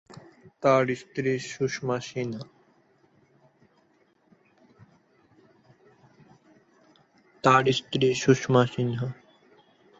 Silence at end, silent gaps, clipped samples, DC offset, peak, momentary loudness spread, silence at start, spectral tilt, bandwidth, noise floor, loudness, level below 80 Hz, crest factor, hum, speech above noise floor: 0.85 s; none; under 0.1%; under 0.1%; -4 dBFS; 13 LU; 0.45 s; -5.5 dB/octave; 8 kHz; -65 dBFS; -25 LUFS; -66 dBFS; 24 dB; none; 41 dB